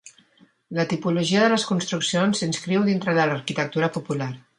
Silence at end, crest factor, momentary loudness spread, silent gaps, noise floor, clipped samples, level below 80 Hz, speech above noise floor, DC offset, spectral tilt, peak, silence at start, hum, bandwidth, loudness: 0.2 s; 16 dB; 8 LU; none; -58 dBFS; under 0.1%; -66 dBFS; 36 dB; under 0.1%; -5 dB/octave; -6 dBFS; 0.05 s; none; 11 kHz; -23 LUFS